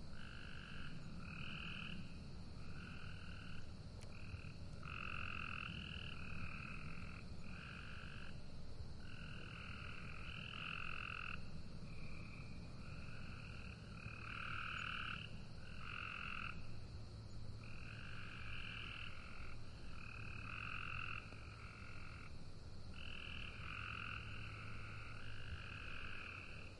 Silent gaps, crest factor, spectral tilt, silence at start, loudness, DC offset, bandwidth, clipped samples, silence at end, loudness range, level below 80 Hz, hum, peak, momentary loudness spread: none; 16 dB; -5 dB/octave; 0 s; -51 LUFS; under 0.1%; 11 kHz; under 0.1%; 0 s; 4 LU; -56 dBFS; none; -32 dBFS; 8 LU